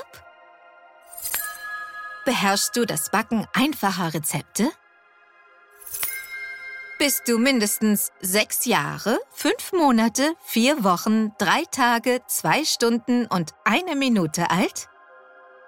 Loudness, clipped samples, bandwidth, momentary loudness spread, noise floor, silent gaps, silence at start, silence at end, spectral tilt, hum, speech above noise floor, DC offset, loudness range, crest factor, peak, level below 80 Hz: -22 LUFS; under 0.1%; 17 kHz; 13 LU; -56 dBFS; none; 0 s; 0.8 s; -3.5 dB/octave; none; 34 dB; under 0.1%; 5 LU; 20 dB; -4 dBFS; -64 dBFS